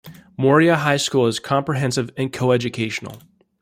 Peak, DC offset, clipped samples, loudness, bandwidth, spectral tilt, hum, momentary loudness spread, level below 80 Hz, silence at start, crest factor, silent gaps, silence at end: -2 dBFS; under 0.1%; under 0.1%; -19 LUFS; 16 kHz; -5 dB/octave; none; 11 LU; -58 dBFS; 0.05 s; 18 dB; none; 0.45 s